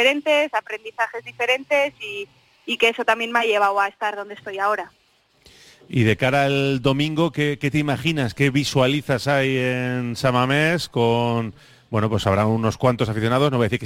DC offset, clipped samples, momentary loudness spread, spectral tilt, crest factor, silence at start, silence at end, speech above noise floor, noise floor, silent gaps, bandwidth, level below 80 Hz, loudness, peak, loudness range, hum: under 0.1%; under 0.1%; 9 LU; -5.5 dB/octave; 16 dB; 0 s; 0 s; 35 dB; -55 dBFS; none; 16 kHz; -52 dBFS; -21 LUFS; -4 dBFS; 2 LU; none